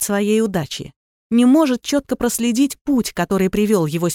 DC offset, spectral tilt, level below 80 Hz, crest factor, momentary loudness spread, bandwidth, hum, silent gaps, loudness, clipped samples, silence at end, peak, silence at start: under 0.1%; -5 dB/octave; -46 dBFS; 14 dB; 9 LU; 17 kHz; none; 0.96-1.30 s, 2.81-2.85 s; -18 LUFS; under 0.1%; 0 s; -4 dBFS; 0 s